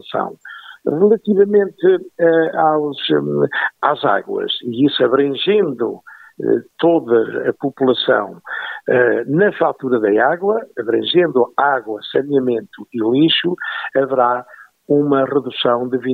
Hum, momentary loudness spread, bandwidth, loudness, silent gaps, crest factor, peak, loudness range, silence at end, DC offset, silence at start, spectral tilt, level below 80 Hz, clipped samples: none; 9 LU; 4.6 kHz; -16 LUFS; none; 16 dB; 0 dBFS; 2 LU; 0 s; under 0.1%; 0.05 s; -8 dB/octave; -68 dBFS; under 0.1%